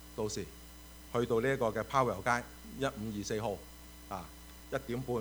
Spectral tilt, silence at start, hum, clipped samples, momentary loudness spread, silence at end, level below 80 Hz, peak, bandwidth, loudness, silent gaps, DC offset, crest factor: -5 dB/octave; 0 s; none; under 0.1%; 20 LU; 0 s; -54 dBFS; -14 dBFS; over 20 kHz; -35 LUFS; none; under 0.1%; 22 dB